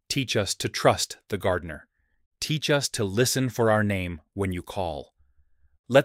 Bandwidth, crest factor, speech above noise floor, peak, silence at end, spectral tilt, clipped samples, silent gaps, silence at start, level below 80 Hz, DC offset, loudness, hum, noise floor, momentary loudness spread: 16 kHz; 22 dB; 36 dB; -4 dBFS; 0 s; -4 dB/octave; under 0.1%; 2.26-2.31 s, 5.79-5.84 s; 0.1 s; -52 dBFS; under 0.1%; -26 LUFS; none; -61 dBFS; 11 LU